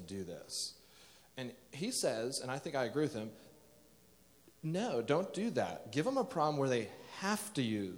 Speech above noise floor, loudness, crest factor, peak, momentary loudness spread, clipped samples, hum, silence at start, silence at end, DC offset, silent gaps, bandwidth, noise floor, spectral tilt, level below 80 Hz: 28 dB; -37 LUFS; 20 dB; -18 dBFS; 13 LU; under 0.1%; none; 0 s; 0 s; under 0.1%; none; over 20 kHz; -65 dBFS; -4.5 dB/octave; -76 dBFS